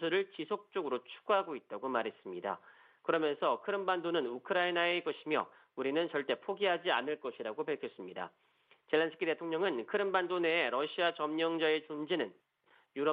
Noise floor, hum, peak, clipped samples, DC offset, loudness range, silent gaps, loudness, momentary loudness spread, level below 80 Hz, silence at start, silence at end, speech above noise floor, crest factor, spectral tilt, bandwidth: -70 dBFS; none; -16 dBFS; under 0.1%; under 0.1%; 3 LU; none; -35 LUFS; 10 LU; -86 dBFS; 0 s; 0 s; 35 dB; 18 dB; -7.5 dB/octave; 5 kHz